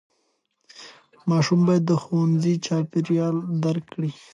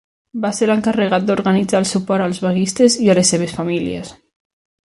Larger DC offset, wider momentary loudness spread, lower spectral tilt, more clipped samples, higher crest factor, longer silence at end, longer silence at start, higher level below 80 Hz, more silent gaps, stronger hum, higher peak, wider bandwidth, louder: neither; about the same, 12 LU vs 11 LU; first, -7 dB/octave vs -4.5 dB/octave; neither; about the same, 14 dB vs 16 dB; second, 0.25 s vs 0.7 s; first, 0.75 s vs 0.35 s; second, -70 dBFS vs -52 dBFS; neither; neither; second, -10 dBFS vs 0 dBFS; second, 8.8 kHz vs 11.5 kHz; second, -23 LUFS vs -16 LUFS